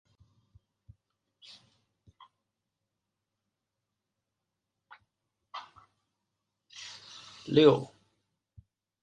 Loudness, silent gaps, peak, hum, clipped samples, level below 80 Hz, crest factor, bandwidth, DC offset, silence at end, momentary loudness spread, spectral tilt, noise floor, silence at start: -25 LUFS; none; -8 dBFS; none; under 0.1%; -72 dBFS; 28 dB; 8.8 kHz; under 0.1%; 1.15 s; 30 LU; -6.5 dB/octave; -86 dBFS; 5.55 s